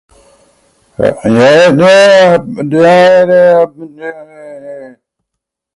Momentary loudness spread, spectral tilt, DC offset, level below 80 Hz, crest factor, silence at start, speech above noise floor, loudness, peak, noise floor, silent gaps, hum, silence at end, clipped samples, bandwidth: 21 LU; -5.5 dB/octave; under 0.1%; -48 dBFS; 8 dB; 1 s; 69 dB; -7 LUFS; 0 dBFS; -76 dBFS; none; none; 0.85 s; under 0.1%; 11.5 kHz